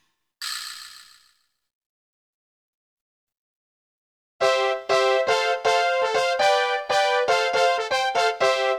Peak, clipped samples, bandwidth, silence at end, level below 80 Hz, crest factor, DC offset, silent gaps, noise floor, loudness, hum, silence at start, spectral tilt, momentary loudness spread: -6 dBFS; under 0.1%; 17.5 kHz; 0 s; -72 dBFS; 18 dB; under 0.1%; 1.73-3.27 s, 3.37-4.39 s; -65 dBFS; -21 LUFS; none; 0.4 s; -1 dB/octave; 11 LU